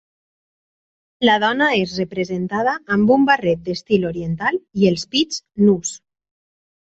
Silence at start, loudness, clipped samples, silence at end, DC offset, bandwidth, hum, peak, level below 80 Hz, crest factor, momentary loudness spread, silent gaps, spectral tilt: 1.2 s; -18 LUFS; under 0.1%; 0.85 s; under 0.1%; 8.2 kHz; none; -2 dBFS; -54 dBFS; 18 dB; 8 LU; none; -5 dB/octave